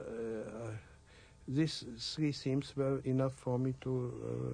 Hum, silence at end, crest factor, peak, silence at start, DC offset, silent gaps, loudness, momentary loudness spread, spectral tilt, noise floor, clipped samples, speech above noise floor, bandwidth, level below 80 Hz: none; 0 s; 16 dB; -20 dBFS; 0 s; under 0.1%; none; -37 LUFS; 10 LU; -6.5 dB/octave; -60 dBFS; under 0.1%; 24 dB; 10 kHz; -62 dBFS